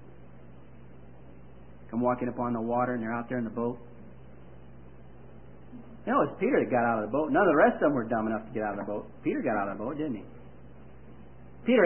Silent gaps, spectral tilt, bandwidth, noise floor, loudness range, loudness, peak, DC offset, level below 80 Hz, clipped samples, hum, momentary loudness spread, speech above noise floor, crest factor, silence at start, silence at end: none; -10.5 dB/octave; 3.2 kHz; -51 dBFS; 8 LU; -29 LUFS; -10 dBFS; 0.4%; -56 dBFS; under 0.1%; none; 19 LU; 23 dB; 20 dB; 0 s; 0 s